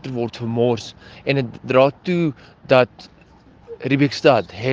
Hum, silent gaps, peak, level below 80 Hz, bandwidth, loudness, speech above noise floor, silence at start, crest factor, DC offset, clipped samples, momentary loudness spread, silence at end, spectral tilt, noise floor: none; none; 0 dBFS; -56 dBFS; 7.8 kHz; -19 LUFS; 30 dB; 0.05 s; 20 dB; under 0.1%; under 0.1%; 10 LU; 0 s; -7 dB/octave; -49 dBFS